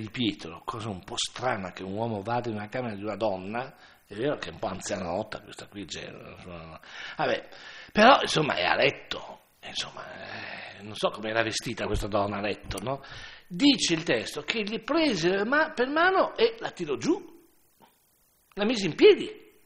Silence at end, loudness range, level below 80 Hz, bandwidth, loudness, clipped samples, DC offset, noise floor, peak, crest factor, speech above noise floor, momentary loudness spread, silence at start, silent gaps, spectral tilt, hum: 0.25 s; 9 LU; -52 dBFS; 15.5 kHz; -27 LUFS; under 0.1%; under 0.1%; -66 dBFS; -4 dBFS; 24 dB; 38 dB; 19 LU; 0 s; none; -4 dB/octave; none